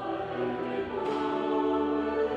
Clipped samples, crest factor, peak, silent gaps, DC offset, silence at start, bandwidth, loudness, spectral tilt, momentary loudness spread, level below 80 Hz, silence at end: under 0.1%; 14 dB; -16 dBFS; none; under 0.1%; 0 s; 8.4 kHz; -30 LUFS; -7 dB/octave; 5 LU; -58 dBFS; 0 s